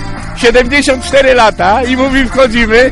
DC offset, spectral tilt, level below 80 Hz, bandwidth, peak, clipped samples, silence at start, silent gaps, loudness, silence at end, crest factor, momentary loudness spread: under 0.1%; -4 dB/octave; -22 dBFS; 11.5 kHz; 0 dBFS; 0.2%; 0 s; none; -8 LUFS; 0 s; 8 dB; 3 LU